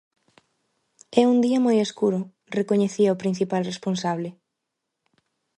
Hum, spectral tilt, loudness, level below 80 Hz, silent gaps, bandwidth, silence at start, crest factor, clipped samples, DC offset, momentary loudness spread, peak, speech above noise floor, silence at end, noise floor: none; -6 dB/octave; -23 LUFS; -70 dBFS; none; 11 kHz; 1.1 s; 20 dB; under 0.1%; under 0.1%; 10 LU; -4 dBFS; 60 dB; 1.25 s; -81 dBFS